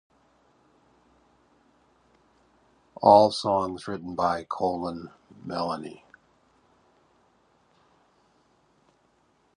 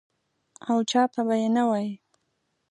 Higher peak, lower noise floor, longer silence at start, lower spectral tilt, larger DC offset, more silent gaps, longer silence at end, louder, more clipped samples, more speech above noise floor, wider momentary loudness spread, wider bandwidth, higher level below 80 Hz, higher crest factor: first, -2 dBFS vs -10 dBFS; second, -66 dBFS vs -75 dBFS; first, 3 s vs 0.65 s; about the same, -6 dB/octave vs -5 dB/octave; neither; neither; first, 3.65 s vs 0.75 s; about the same, -25 LUFS vs -25 LUFS; neither; second, 42 dB vs 51 dB; first, 23 LU vs 14 LU; about the same, 10.5 kHz vs 10.5 kHz; first, -62 dBFS vs -80 dBFS; first, 28 dB vs 18 dB